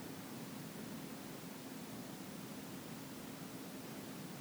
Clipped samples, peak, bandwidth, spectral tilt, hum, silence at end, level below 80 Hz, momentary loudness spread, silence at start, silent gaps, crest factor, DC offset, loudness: under 0.1%; -36 dBFS; over 20 kHz; -4.5 dB/octave; none; 0 s; -76 dBFS; 1 LU; 0 s; none; 14 dB; under 0.1%; -49 LUFS